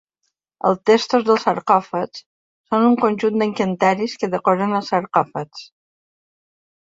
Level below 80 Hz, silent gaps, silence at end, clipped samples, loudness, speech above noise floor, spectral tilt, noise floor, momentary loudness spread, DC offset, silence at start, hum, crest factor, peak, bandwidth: -64 dBFS; 2.26-2.64 s; 1.3 s; under 0.1%; -19 LUFS; 56 dB; -6 dB/octave; -74 dBFS; 11 LU; under 0.1%; 0.65 s; none; 18 dB; -2 dBFS; 7.8 kHz